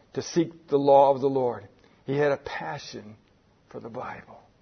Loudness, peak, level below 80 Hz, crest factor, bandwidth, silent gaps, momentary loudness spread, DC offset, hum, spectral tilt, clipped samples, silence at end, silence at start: -24 LUFS; -6 dBFS; -64 dBFS; 20 dB; 6.6 kHz; none; 24 LU; under 0.1%; none; -6 dB/octave; under 0.1%; 0.25 s; 0.15 s